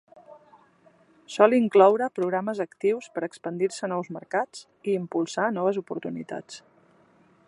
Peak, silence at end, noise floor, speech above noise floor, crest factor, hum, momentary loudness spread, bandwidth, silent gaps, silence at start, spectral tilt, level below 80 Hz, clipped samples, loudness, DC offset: -2 dBFS; 0.9 s; -60 dBFS; 35 dB; 24 dB; none; 17 LU; 11 kHz; none; 0.3 s; -5.5 dB/octave; -78 dBFS; under 0.1%; -25 LUFS; under 0.1%